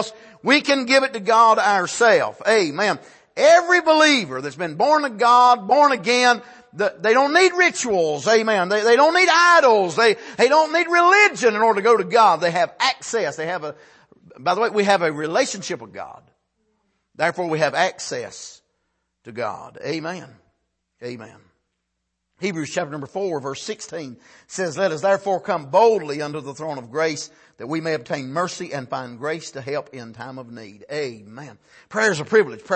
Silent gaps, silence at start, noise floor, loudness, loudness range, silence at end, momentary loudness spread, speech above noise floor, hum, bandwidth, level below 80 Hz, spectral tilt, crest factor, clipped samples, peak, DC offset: none; 0 s; -77 dBFS; -18 LUFS; 15 LU; 0 s; 18 LU; 58 dB; none; 8.8 kHz; -70 dBFS; -3.5 dB/octave; 18 dB; under 0.1%; -2 dBFS; under 0.1%